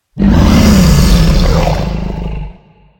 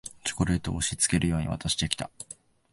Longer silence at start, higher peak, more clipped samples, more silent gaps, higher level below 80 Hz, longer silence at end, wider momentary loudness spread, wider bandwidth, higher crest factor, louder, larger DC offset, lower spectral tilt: about the same, 0.15 s vs 0.05 s; first, 0 dBFS vs -4 dBFS; first, 0.8% vs under 0.1%; neither; first, -14 dBFS vs -42 dBFS; about the same, 0.45 s vs 0.4 s; about the same, 15 LU vs 17 LU; first, 17.5 kHz vs 12 kHz; second, 10 dB vs 24 dB; first, -10 LUFS vs -27 LUFS; neither; first, -6 dB/octave vs -3.5 dB/octave